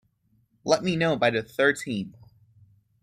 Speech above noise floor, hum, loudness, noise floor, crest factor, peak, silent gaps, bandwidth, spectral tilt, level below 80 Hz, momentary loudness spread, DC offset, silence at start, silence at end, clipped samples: 43 dB; none; -25 LUFS; -67 dBFS; 20 dB; -8 dBFS; none; 15 kHz; -5 dB/octave; -64 dBFS; 12 LU; under 0.1%; 0.65 s; 0.9 s; under 0.1%